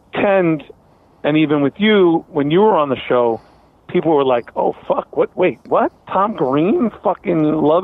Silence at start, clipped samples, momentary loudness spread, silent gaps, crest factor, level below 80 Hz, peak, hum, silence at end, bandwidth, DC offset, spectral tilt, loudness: 0.15 s; under 0.1%; 7 LU; none; 14 dB; -54 dBFS; -2 dBFS; none; 0 s; 4.1 kHz; under 0.1%; -9.5 dB/octave; -16 LUFS